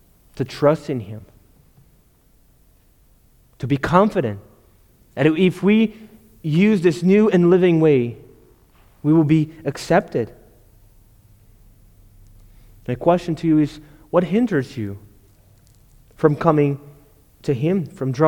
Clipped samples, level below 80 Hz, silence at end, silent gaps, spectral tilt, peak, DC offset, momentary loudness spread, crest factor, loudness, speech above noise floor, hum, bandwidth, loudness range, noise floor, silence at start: under 0.1%; -52 dBFS; 0 s; none; -8 dB/octave; 0 dBFS; under 0.1%; 16 LU; 20 dB; -19 LUFS; 38 dB; none; 18 kHz; 10 LU; -55 dBFS; 0.35 s